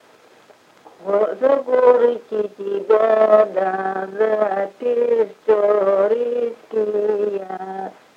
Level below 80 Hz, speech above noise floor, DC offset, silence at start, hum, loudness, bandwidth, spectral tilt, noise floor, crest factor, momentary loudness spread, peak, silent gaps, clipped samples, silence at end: -78 dBFS; 32 dB; under 0.1%; 1 s; none; -18 LUFS; 7.2 kHz; -6.5 dB/octave; -50 dBFS; 18 dB; 11 LU; 0 dBFS; none; under 0.1%; 0.25 s